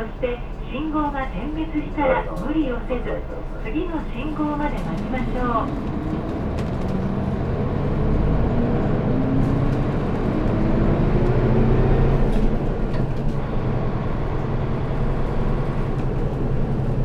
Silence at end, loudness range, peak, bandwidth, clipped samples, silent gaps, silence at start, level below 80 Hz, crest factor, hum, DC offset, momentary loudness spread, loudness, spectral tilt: 0 s; 5 LU; -6 dBFS; 6.4 kHz; under 0.1%; none; 0 s; -26 dBFS; 16 dB; none; under 0.1%; 7 LU; -23 LUFS; -9 dB/octave